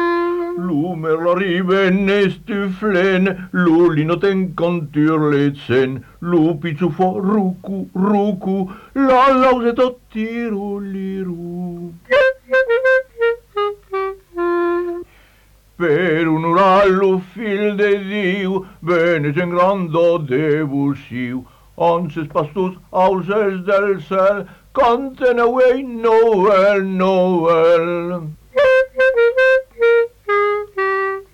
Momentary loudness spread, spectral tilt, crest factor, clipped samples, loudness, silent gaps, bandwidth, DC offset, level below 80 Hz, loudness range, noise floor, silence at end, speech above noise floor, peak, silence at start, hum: 11 LU; -7.5 dB/octave; 12 dB; under 0.1%; -16 LUFS; none; 9.8 kHz; under 0.1%; -50 dBFS; 4 LU; -50 dBFS; 0.1 s; 35 dB; -6 dBFS; 0 s; none